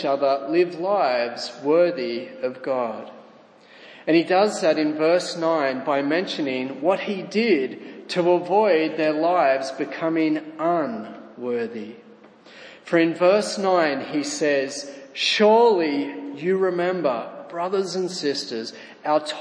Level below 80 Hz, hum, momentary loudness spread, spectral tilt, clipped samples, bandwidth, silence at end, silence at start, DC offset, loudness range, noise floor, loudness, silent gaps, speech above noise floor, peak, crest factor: -80 dBFS; none; 12 LU; -4.5 dB/octave; under 0.1%; 10.5 kHz; 0 s; 0 s; under 0.1%; 4 LU; -50 dBFS; -22 LUFS; none; 28 dB; -6 dBFS; 18 dB